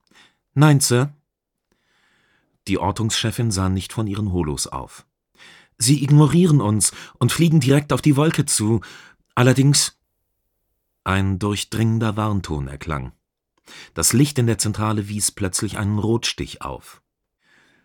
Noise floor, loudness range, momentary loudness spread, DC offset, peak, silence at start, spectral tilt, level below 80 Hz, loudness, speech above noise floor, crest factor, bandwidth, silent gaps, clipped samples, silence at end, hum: -79 dBFS; 7 LU; 14 LU; under 0.1%; -2 dBFS; 0.55 s; -5 dB/octave; -44 dBFS; -19 LUFS; 60 dB; 20 dB; 19 kHz; none; under 0.1%; 0.95 s; none